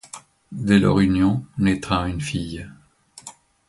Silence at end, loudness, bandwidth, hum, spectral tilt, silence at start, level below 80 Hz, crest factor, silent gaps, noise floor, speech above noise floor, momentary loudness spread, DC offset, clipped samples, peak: 0.35 s; -20 LUFS; 11.5 kHz; none; -6.5 dB/octave; 0.15 s; -40 dBFS; 18 dB; none; -45 dBFS; 25 dB; 23 LU; under 0.1%; under 0.1%; -4 dBFS